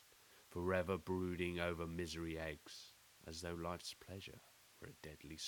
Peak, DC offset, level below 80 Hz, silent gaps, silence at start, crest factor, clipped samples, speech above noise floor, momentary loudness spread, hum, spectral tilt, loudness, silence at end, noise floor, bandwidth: -24 dBFS; under 0.1%; -64 dBFS; none; 0 s; 22 dB; under 0.1%; 22 dB; 19 LU; none; -5 dB/octave; -45 LUFS; 0 s; -67 dBFS; 19.5 kHz